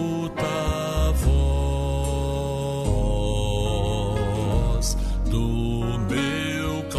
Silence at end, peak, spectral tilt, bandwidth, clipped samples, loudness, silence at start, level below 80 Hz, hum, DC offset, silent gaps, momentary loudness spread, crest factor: 0 s; -10 dBFS; -6 dB/octave; 13.5 kHz; under 0.1%; -25 LUFS; 0 s; -26 dBFS; none; under 0.1%; none; 4 LU; 14 dB